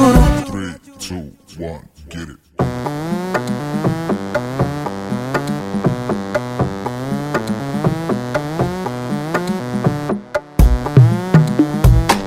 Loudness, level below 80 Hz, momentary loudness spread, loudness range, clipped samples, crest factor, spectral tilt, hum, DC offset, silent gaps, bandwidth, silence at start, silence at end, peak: -18 LUFS; -24 dBFS; 17 LU; 7 LU; under 0.1%; 16 dB; -7 dB/octave; none; under 0.1%; none; 16 kHz; 0 s; 0 s; 0 dBFS